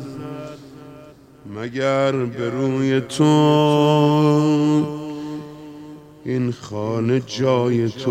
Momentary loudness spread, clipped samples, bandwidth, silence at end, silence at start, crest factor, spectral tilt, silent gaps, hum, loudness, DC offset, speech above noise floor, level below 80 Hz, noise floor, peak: 21 LU; under 0.1%; 13.5 kHz; 0 s; 0 s; 16 dB; -7 dB/octave; none; none; -19 LUFS; under 0.1%; 26 dB; -60 dBFS; -44 dBFS; -2 dBFS